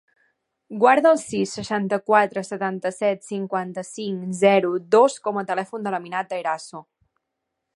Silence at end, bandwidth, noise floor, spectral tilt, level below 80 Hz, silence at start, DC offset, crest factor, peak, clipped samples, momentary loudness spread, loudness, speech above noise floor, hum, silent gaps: 0.95 s; 11.5 kHz; -80 dBFS; -5 dB/octave; -68 dBFS; 0.7 s; under 0.1%; 20 dB; -2 dBFS; under 0.1%; 12 LU; -22 LUFS; 59 dB; none; none